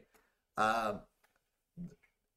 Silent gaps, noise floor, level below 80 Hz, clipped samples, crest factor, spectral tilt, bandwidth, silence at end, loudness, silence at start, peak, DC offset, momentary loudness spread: none; -81 dBFS; -66 dBFS; under 0.1%; 22 dB; -4.5 dB/octave; 15.5 kHz; 0.45 s; -35 LUFS; 0.55 s; -18 dBFS; under 0.1%; 19 LU